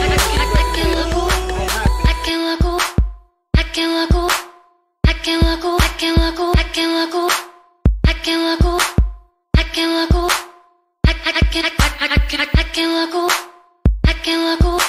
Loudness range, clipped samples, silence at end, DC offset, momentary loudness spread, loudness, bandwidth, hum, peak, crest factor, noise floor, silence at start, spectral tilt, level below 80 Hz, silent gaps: 1 LU; under 0.1%; 0 s; under 0.1%; 4 LU; -17 LUFS; 15.5 kHz; none; 0 dBFS; 16 dB; -52 dBFS; 0 s; -4.5 dB/octave; -20 dBFS; none